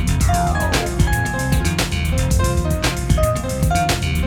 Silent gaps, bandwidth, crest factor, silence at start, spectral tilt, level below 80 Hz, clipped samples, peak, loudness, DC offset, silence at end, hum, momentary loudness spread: none; 19.5 kHz; 14 dB; 0 s; -5 dB/octave; -22 dBFS; under 0.1%; -4 dBFS; -19 LUFS; under 0.1%; 0 s; none; 2 LU